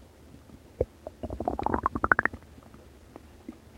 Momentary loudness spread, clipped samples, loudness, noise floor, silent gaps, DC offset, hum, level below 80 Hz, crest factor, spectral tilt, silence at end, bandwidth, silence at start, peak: 27 LU; under 0.1%; -29 LUFS; -52 dBFS; none; under 0.1%; none; -46 dBFS; 32 dB; -7 dB/octave; 0.2 s; 16.5 kHz; 0 s; -2 dBFS